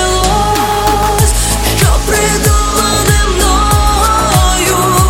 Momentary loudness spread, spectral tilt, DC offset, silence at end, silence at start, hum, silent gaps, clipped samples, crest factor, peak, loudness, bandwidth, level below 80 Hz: 2 LU; -3.5 dB/octave; under 0.1%; 0 s; 0 s; none; none; under 0.1%; 10 dB; 0 dBFS; -10 LUFS; 17.5 kHz; -16 dBFS